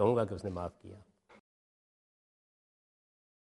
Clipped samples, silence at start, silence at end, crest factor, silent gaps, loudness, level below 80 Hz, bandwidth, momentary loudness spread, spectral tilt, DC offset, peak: under 0.1%; 0 s; 2.5 s; 24 dB; none; -36 LUFS; -68 dBFS; 11.5 kHz; 23 LU; -8.5 dB/octave; under 0.1%; -14 dBFS